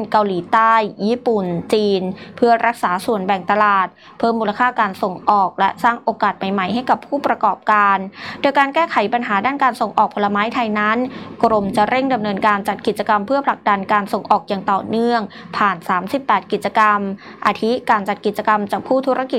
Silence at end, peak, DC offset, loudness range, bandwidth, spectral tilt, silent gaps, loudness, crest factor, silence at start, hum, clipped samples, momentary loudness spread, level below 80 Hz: 0 s; -2 dBFS; under 0.1%; 1 LU; 16 kHz; -6 dB/octave; none; -17 LUFS; 14 dB; 0 s; none; under 0.1%; 6 LU; -58 dBFS